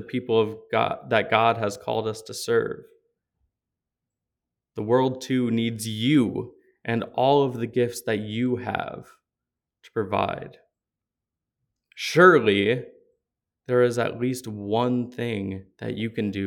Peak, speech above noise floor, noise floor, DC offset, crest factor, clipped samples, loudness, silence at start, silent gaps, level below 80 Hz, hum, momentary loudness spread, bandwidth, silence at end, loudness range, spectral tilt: -2 dBFS; 64 dB; -87 dBFS; under 0.1%; 22 dB; under 0.1%; -24 LUFS; 0 s; none; -66 dBFS; none; 13 LU; 18 kHz; 0 s; 9 LU; -5.5 dB/octave